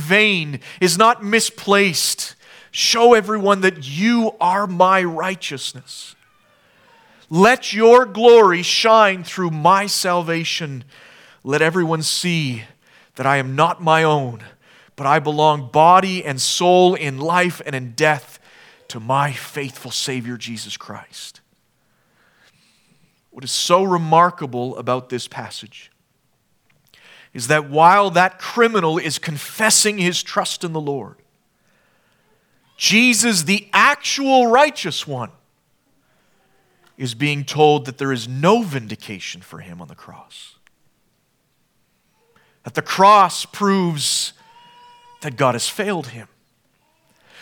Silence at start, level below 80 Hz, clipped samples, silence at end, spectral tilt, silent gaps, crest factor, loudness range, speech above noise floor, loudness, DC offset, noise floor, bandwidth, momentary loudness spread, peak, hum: 0 s; -68 dBFS; under 0.1%; 1.2 s; -3.5 dB/octave; none; 18 dB; 10 LU; 48 dB; -16 LUFS; under 0.1%; -65 dBFS; 19 kHz; 18 LU; 0 dBFS; none